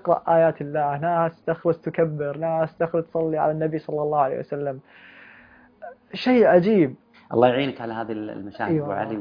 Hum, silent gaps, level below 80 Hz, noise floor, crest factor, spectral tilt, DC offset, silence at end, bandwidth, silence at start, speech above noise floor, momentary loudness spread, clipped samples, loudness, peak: none; none; -62 dBFS; -51 dBFS; 20 dB; -9 dB/octave; under 0.1%; 0 s; 5.2 kHz; 0.05 s; 29 dB; 13 LU; under 0.1%; -23 LUFS; -4 dBFS